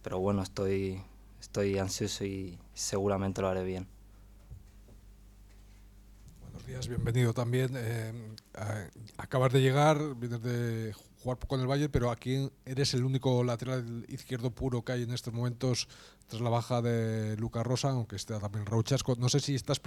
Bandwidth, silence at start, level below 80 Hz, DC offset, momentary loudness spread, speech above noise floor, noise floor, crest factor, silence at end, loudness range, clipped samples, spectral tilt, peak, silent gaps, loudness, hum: 14.5 kHz; 0 s; -54 dBFS; under 0.1%; 12 LU; 23 dB; -55 dBFS; 20 dB; 0.05 s; 6 LU; under 0.1%; -5.5 dB/octave; -12 dBFS; none; -32 LUFS; none